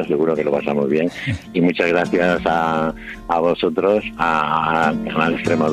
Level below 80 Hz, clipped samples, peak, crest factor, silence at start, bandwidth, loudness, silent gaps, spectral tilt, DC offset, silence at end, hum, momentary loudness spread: -44 dBFS; under 0.1%; -2 dBFS; 16 dB; 0 s; 13 kHz; -18 LUFS; none; -6.5 dB/octave; under 0.1%; 0 s; none; 5 LU